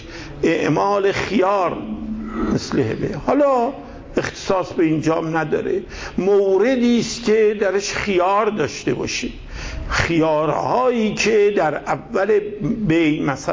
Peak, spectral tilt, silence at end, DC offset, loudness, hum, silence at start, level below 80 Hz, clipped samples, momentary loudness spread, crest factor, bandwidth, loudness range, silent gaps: -4 dBFS; -5.5 dB/octave; 0 s; under 0.1%; -19 LUFS; none; 0 s; -40 dBFS; under 0.1%; 9 LU; 16 dB; 7.8 kHz; 2 LU; none